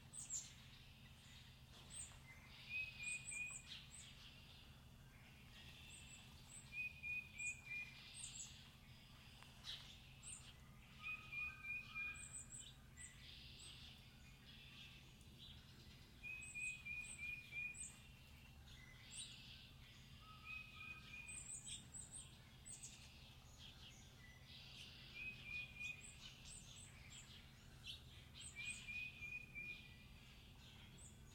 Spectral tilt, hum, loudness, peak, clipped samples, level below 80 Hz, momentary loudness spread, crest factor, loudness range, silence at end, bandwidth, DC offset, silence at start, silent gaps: -1.5 dB/octave; none; -53 LUFS; -36 dBFS; under 0.1%; -68 dBFS; 15 LU; 20 dB; 6 LU; 0 s; 16 kHz; under 0.1%; 0 s; none